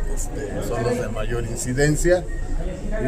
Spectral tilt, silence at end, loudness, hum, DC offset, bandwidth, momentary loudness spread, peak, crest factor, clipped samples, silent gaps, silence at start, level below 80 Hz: -5.5 dB/octave; 0 s; -24 LUFS; none; under 0.1%; 15.5 kHz; 11 LU; -6 dBFS; 16 dB; under 0.1%; none; 0 s; -26 dBFS